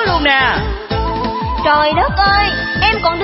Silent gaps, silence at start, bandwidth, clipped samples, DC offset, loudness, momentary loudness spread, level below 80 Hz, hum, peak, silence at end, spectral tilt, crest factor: none; 0 s; 5.8 kHz; under 0.1%; under 0.1%; -14 LUFS; 7 LU; -26 dBFS; none; 0 dBFS; 0 s; -8 dB/octave; 14 dB